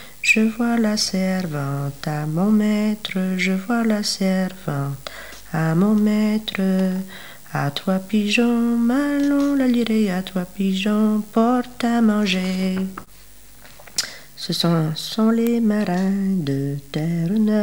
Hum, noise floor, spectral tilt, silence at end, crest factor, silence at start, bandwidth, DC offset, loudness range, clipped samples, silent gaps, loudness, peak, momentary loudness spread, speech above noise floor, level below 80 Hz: none; -47 dBFS; -5.5 dB/octave; 0 s; 14 dB; 0 s; 19.5 kHz; 0.8%; 3 LU; under 0.1%; none; -20 LUFS; -6 dBFS; 9 LU; 27 dB; -52 dBFS